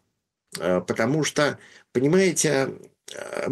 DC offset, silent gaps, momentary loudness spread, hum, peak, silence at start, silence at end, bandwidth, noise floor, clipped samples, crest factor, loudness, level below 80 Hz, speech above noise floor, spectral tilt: under 0.1%; none; 19 LU; none; -8 dBFS; 0.5 s; 0 s; 12.5 kHz; -77 dBFS; under 0.1%; 16 dB; -23 LUFS; -64 dBFS; 53 dB; -4.5 dB/octave